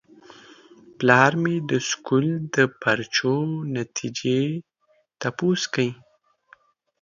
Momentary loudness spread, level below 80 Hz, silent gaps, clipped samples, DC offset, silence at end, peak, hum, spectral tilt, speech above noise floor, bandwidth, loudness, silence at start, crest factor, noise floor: 11 LU; -66 dBFS; none; under 0.1%; under 0.1%; 1.1 s; 0 dBFS; none; -5 dB/octave; 43 dB; 7.4 kHz; -23 LUFS; 1 s; 24 dB; -66 dBFS